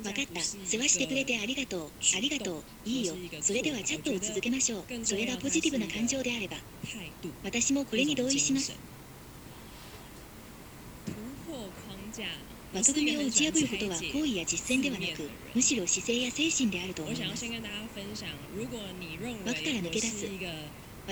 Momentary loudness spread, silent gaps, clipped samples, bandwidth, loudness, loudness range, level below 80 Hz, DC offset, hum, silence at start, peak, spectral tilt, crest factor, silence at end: 19 LU; none; under 0.1%; over 20 kHz; -30 LUFS; 7 LU; -56 dBFS; under 0.1%; none; 0 s; -10 dBFS; -2 dB/octave; 22 dB; 0 s